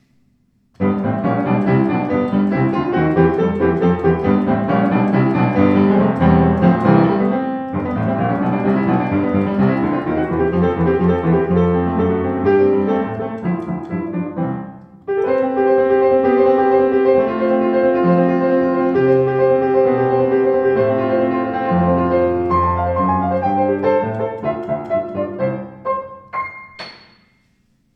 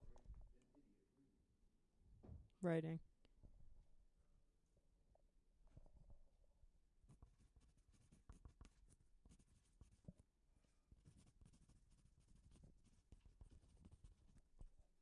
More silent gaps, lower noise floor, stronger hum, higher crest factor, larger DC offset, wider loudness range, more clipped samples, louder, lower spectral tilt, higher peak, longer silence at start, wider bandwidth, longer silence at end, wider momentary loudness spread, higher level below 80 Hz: neither; second, -60 dBFS vs -79 dBFS; neither; second, 16 dB vs 28 dB; neither; first, 5 LU vs 0 LU; neither; first, -16 LUFS vs -47 LUFS; first, -10.5 dB/octave vs -8 dB/octave; first, 0 dBFS vs -30 dBFS; first, 0.8 s vs 0 s; second, 5.8 kHz vs 10.5 kHz; first, 1 s vs 0.2 s; second, 10 LU vs 24 LU; first, -42 dBFS vs -70 dBFS